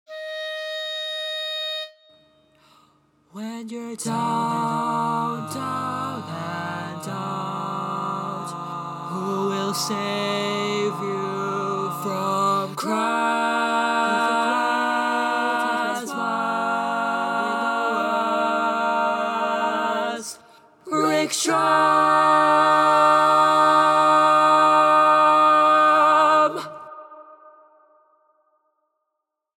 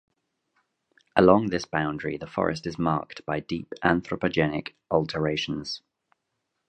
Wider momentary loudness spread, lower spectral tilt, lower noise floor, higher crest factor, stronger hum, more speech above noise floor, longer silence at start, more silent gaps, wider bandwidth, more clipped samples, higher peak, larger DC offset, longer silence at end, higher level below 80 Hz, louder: first, 15 LU vs 12 LU; second, -4 dB/octave vs -6.5 dB/octave; about the same, -80 dBFS vs -80 dBFS; second, 18 dB vs 24 dB; neither; about the same, 55 dB vs 54 dB; second, 0.1 s vs 1.15 s; neither; first, 17 kHz vs 9 kHz; neither; about the same, -4 dBFS vs -2 dBFS; neither; first, 2.1 s vs 0.9 s; second, -76 dBFS vs -54 dBFS; first, -21 LUFS vs -26 LUFS